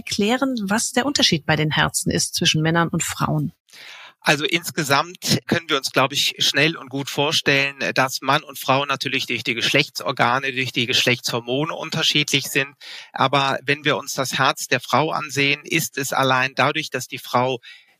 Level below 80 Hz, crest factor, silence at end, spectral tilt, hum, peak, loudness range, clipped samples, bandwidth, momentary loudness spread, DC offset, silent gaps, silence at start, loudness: -56 dBFS; 20 dB; 0.2 s; -3 dB/octave; none; -2 dBFS; 2 LU; under 0.1%; 15.5 kHz; 7 LU; under 0.1%; 3.60-3.65 s; 0.05 s; -20 LUFS